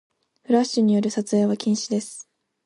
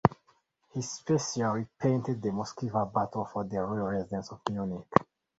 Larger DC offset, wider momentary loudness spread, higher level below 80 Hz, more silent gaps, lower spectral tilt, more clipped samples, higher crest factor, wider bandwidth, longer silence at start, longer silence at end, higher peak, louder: neither; about the same, 9 LU vs 7 LU; second, -70 dBFS vs -58 dBFS; neither; about the same, -5.5 dB/octave vs -6 dB/octave; neither; second, 16 dB vs 30 dB; first, 11.5 kHz vs 8 kHz; first, 0.5 s vs 0.05 s; about the same, 0.45 s vs 0.35 s; second, -6 dBFS vs -2 dBFS; first, -22 LUFS vs -32 LUFS